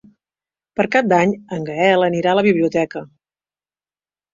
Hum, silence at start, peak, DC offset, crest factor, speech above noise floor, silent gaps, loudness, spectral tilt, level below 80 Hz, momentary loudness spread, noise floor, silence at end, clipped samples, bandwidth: 50 Hz at -40 dBFS; 0.8 s; -2 dBFS; under 0.1%; 18 dB; over 73 dB; none; -17 LUFS; -6.5 dB/octave; -60 dBFS; 11 LU; under -90 dBFS; 1.25 s; under 0.1%; 7.6 kHz